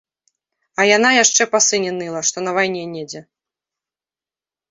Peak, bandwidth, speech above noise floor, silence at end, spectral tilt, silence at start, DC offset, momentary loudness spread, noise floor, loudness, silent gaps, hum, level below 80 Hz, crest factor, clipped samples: 0 dBFS; 8 kHz; over 73 dB; 1.5 s; -1.5 dB/octave; 0.8 s; under 0.1%; 18 LU; under -90 dBFS; -15 LUFS; none; none; -68 dBFS; 20 dB; under 0.1%